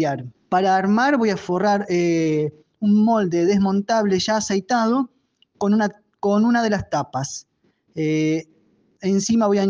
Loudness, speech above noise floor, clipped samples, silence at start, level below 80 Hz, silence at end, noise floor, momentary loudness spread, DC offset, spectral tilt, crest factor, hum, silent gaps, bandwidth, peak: -20 LUFS; 41 dB; under 0.1%; 0 s; -58 dBFS; 0 s; -60 dBFS; 9 LU; under 0.1%; -5.5 dB/octave; 12 dB; none; none; 9.4 kHz; -8 dBFS